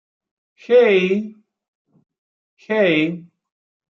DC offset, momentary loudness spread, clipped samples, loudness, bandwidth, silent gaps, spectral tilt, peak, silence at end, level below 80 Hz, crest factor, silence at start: under 0.1%; 15 LU; under 0.1%; -17 LUFS; 6.4 kHz; 1.68-1.85 s, 2.18-2.57 s; -7 dB/octave; -4 dBFS; 0.65 s; -72 dBFS; 16 dB; 0.7 s